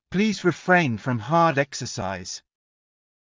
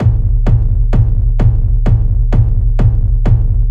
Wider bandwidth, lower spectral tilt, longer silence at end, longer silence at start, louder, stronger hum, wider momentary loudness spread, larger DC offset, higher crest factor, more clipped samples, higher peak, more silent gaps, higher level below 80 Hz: first, 7.6 kHz vs 3.3 kHz; second, -5.5 dB/octave vs -10 dB/octave; first, 0.9 s vs 0 s; about the same, 0.1 s vs 0 s; second, -23 LUFS vs -14 LUFS; neither; first, 12 LU vs 1 LU; neither; first, 18 dB vs 10 dB; neither; second, -6 dBFS vs 0 dBFS; neither; second, -56 dBFS vs -12 dBFS